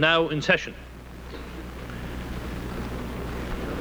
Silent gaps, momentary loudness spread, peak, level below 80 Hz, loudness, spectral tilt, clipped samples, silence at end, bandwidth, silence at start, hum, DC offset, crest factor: none; 18 LU; -6 dBFS; -38 dBFS; -29 LUFS; -5 dB/octave; under 0.1%; 0 s; over 20 kHz; 0 s; none; under 0.1%; 22 dB